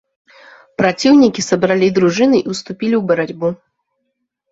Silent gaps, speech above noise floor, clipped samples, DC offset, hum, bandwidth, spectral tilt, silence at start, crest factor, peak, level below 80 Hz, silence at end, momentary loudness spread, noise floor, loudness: none; 58 dB; under 0.1%; under 0.1%; none; 8 kHz; -5.5 dB/octave; 0.8 s; 14 dB; 0 dBFS; -54 dBFS; 0.95 s; 11 LU; -72 dBFS; -14 LUFS